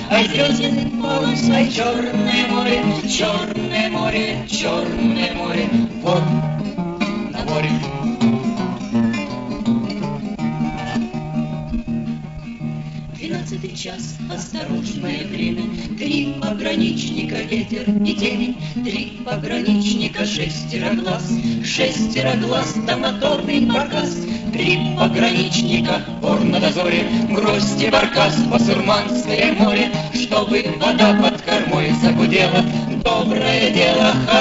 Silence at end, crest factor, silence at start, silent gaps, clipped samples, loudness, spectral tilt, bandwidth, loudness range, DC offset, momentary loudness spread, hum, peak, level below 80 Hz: 0 s; 18 dB; 0 s; none; under 0.1%; -18 LUFS; -5 dB/octave; 8 kHz; 9 LU; under 0.1%; 10 LU; none; 0 dBFS; -42 dBFS